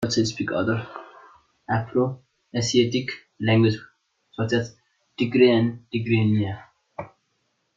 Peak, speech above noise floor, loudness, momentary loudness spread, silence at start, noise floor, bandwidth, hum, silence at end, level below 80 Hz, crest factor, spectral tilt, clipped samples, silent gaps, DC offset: -4 dBFS; 50 dB; -23 LUFS; 21 LU; 0 s; -72 dBFS; 7.8 kHz; none; 0.7 s; -60 dBFS; 20 dB; -6 dB/octave; under 0.1%; none; under 0.1%